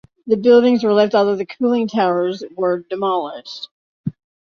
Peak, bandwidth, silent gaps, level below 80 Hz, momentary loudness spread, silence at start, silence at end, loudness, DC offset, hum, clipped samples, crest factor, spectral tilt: -2 dBFS; 6.6 kHz; 3.71-4.04 s; -62 dBFS; 18 LU; 0.25 s; 0.4 s; -17 LUFS; under 0.1%; none; under 0.1%; 16 dB; -7 dB/octave